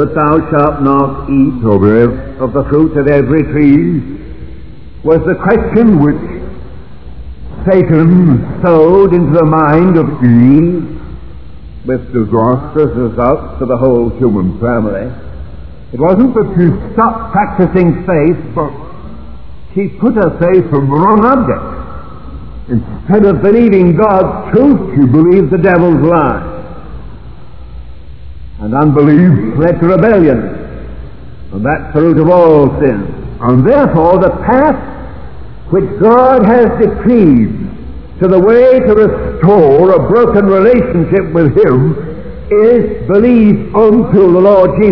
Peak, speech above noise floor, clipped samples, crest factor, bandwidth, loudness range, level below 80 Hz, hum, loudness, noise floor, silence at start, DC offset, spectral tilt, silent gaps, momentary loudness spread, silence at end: 0 dBFS; 23 dB; 2%; 10 dB; 5.4 kHz; 5 LU; -30 dBFS; none; -9 LUFS; -30 dBFS; 0 s; 4%; -12 dB/octave; none; 19 LU; 0 s